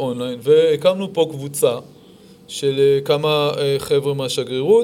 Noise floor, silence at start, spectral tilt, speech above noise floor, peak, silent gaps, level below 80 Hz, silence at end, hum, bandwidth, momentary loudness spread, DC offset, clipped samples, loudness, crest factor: -45 dBFS; 0 s; -5 dB/octave; 28 dB; -2 dBFS; none; -60 dBFS; 0 s; none; 16 kHz; 8 LU; under 0.1%; under 0.1%; -18 LUFS; 16 dB